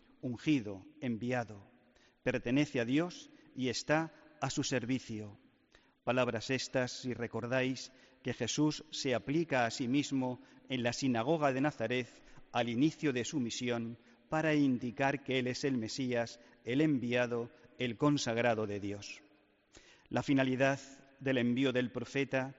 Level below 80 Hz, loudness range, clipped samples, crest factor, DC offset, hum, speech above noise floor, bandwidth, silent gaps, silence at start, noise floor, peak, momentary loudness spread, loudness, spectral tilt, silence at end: -68 dBFS; 3 LU; under 0.1%; 18 dB; under 0.1%; none; 34 dB; 8 kHz; none; 0.25 s; -68 dBFS; -18 dBFS; 12 LU; -35 LUFS; -4.5 dB/octave; 0.05 s